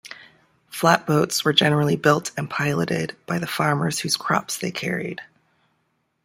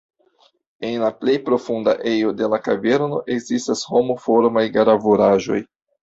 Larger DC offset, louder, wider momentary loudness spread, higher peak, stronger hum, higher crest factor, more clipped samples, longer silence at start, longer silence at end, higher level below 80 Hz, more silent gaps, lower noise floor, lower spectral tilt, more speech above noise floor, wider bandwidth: neither; about the same, -21 LUFS vs -19 LUFS; first, 11 LU vs 8 LU; about the same, -2 dBFS vs -2 dBFS; neither; first, 22 dB vs 16 dB; neither; second, 0.05 s vs 0.8 s; first, 1 s vs 0.4 s; about the same, -62 dBFS vs -60 dBFS; neither; first, -71 dBFS vs -59 dBFS; about the same, -4.5 dB/octave vs -5.5 dB/octave; first, 49 dB vs 41 dB; first, 16.5 kHz vs 8 kHz